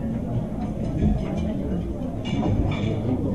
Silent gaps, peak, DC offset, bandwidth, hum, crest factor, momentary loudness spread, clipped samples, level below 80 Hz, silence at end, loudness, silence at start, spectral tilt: none; -10 dBFS; 0.8%; 11 kHz; none; 14 dB; 5 LU; under 0.1%; -32 dBFS; 0 s; -26 LUFS; 0 s; -8.5 dB/octave